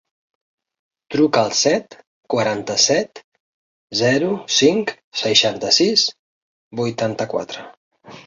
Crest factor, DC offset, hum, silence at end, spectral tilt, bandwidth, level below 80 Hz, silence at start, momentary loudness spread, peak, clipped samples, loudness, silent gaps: 20 dB; under 0.1%; none; 0.05 s; -3 dB/octave; 7.8 kHz; -62 dBFS; 1.1 s; 10 LU; 0 dBFS; under 0.1%; -18 LUFS; 2.07-2.23 s, 3.24-3.32 s, 3.40-3.88 s, 5.04-5.12 s, 6.19-6.71 s, 7.77-7.91 s